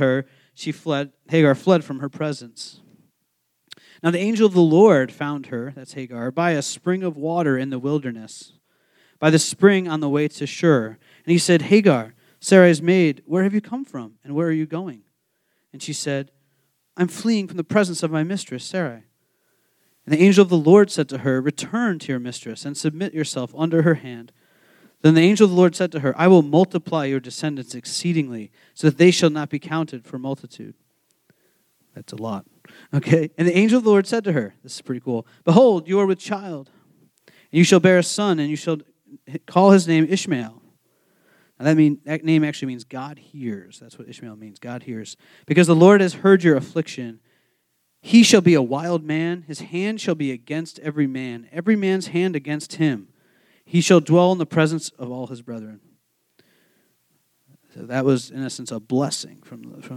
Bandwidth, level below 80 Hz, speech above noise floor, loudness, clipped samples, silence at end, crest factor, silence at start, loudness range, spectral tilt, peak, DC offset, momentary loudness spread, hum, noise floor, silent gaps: 14 kHz; -74 dBFS; 53 dB; -19 LUFS; under 0.1%; 0 s; 20 dB; 0 s; 9 LU; -6 dB/octave; 0 dBFS; under 0.1%; 19 LU; none; -72 dBFS; none